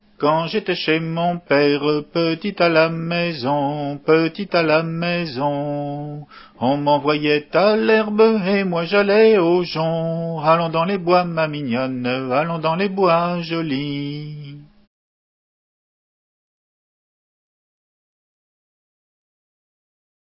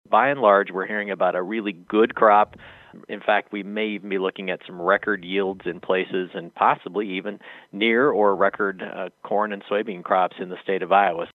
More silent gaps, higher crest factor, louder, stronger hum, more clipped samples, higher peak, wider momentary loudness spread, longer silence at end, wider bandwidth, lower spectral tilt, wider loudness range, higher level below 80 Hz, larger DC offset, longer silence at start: neither; about the same, 18 dB vs 20 dB; first, -19 LUFS vs -22 LUFS; neither; neither; about the same, -2 dBFS vs -2 dBFS; second, 8 LU vs 13 LU; first, 5.65 s vs 0.05 s; first, 5.8 kHz vs 4.3 kHz; first, -10.5 dB/octave vs -7.5 dB/octave; first, 7 LU vs 4 LU; about the same, -62 dBFS vs -66 dBFS; neither; about the same, 0.2 s vs 0.1 s